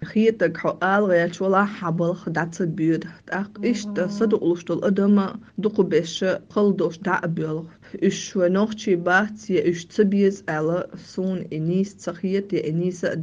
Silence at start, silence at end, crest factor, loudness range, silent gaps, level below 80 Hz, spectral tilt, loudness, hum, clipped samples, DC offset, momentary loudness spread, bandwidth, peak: 0 s; 0 s; 16 dB; 2 LU; none; -62 dBFS; -6.5 dB/octave; -23 LUFS; none; under 0.1%; under 0.1%; 8 LU; 7.6 kHz; -6 dBFS